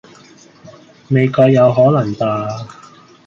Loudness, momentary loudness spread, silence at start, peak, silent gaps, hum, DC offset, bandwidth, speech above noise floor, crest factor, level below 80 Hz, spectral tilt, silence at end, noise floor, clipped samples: -13 LUFS; 15 LU; 0.65 s; -2 dBFS; none; none; under 0.1%; 7.4 kHz; 31 dB; 14 dB; -54 dBFS; -8.5 dB/octave; 0.55 s; -44 dBFS; under 0.1%